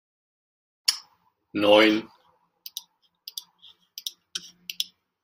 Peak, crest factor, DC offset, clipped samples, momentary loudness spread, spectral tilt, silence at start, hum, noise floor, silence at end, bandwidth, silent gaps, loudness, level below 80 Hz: 0 dBFS; 28 dB; under 0.1%; under 0.1%; 22 LU; -2.5 dB/octave; 0.9 s; none; -65 dBFS; 0.4 s; 16 kHz; none; -24 LUFS; -74 dBFS